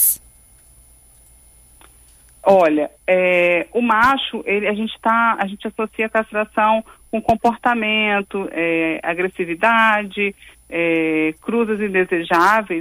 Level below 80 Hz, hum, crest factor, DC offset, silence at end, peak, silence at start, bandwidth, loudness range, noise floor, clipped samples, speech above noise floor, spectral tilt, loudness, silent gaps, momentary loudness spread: -52 dBFS; none; 16 dB; under 0.1%; 0 s; -2 dBFS; 0 s; 15.5 kHz; 2 LU; -49 dBFS; under 0.1%; 31 dB; -3.5 dB/octave; -18 LUFS; none; 8 LU